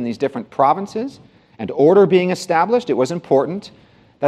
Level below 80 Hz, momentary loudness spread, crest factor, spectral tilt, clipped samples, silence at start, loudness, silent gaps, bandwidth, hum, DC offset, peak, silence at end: -64 dBFS; 14 LU; 16 dB; -6.5 dB/octave; under 0.1%; 0 s; -17 LUFS; none; 12 kHz; none; under 0.1%; -2 dBFS; 0 s